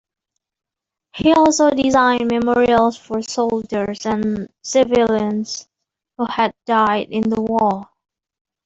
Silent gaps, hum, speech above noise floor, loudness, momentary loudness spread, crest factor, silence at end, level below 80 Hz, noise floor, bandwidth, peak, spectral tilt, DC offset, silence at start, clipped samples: none; none; 62 dB; -17 LUFS; 11 LU; 16 dB; 0.8 s; -50 dBFS; -79 dBFS; 8 kHz; -2 dBFS; -4.5 dB/octave; under 0.1%; 1.15 s; under 0.1%